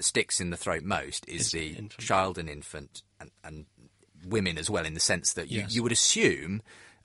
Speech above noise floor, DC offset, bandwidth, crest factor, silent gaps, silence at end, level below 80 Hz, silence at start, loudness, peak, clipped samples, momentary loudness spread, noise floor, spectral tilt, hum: 29 dB; under 0.1%; 11.5 kHz; 22 dB; none; 0.15 s; -54 dBFS; 0 s; -28 LUFS; -10 dBFS; under 0.1%; 23 LU; -59 dBFS; -2.5 dB/octave; none